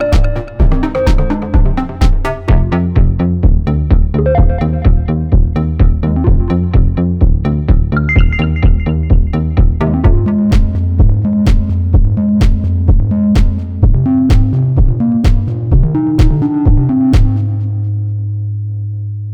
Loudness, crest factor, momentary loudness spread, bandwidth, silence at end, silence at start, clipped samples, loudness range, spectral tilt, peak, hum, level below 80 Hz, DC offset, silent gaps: -13 LUFS; 10 dB; 5 LU; 7 kHz; 0 s; 0 s; under 0.1%; 1 LU; -9 dB/octave; 0 dBFS; none; -12 dBFS; under 0.1%; none